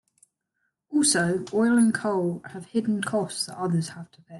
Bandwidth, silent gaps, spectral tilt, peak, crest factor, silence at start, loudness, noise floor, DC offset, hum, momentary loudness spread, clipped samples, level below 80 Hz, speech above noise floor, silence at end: 12.5 kHz; none; -4.5 dB/octave; -8 dBFS; 16 dB; 0.9 s; -25 LUFS; -78 dBFS; under 0.1%; none; 10 LU; under 0.1%; -68 dBFS; 53 dB; 0 s